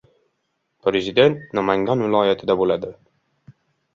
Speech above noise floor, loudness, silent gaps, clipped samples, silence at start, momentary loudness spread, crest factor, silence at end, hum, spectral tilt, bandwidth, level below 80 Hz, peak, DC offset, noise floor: 54 dB; -20 LUFS; none; under 0.1%; 0.85 s; 8 LU; 20 dB; 1.05 s; none; -6.5 dB/octave; 7.2 kHz; -56 dBFS; -2 dBFS; under 0.1%; -73 dBFS